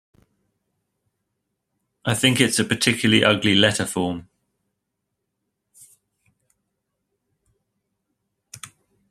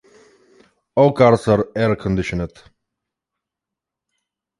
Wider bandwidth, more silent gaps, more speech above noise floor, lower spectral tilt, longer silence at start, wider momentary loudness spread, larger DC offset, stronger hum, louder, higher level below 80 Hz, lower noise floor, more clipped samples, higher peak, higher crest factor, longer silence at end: first, 14.5 kHz vs 11.5 kHz; neither; second, 60 dB vs 69 dB; second, -3.5 dB/octave vs -7.5 dB/octave; first, 2.05 s vs 0.95 s; first, 20 LU vs 12 LU; neither; neither; about the same, -19 LUFS vs -17 LUFS; second, -60 dBFS vs -44 dBFS; second, -79 dBFS vs -85 dBFS; neither; about the same, -2 dBFS vs 0 dBFS; about the same, 24 dB vs 20 dB; second, 0.45 s vs 2.1 s